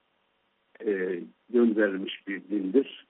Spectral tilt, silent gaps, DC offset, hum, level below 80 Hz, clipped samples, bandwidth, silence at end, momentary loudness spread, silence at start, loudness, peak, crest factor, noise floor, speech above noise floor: -4.5 dB/octave; none; under 0.1%; none; -80 dBFS; under 0.1%; 4 kHz; 0.1 s; 11 LU; 0.8 s; -28 LUFS; -10 dBFS; 18 dB; -72 dBFS; 45 dB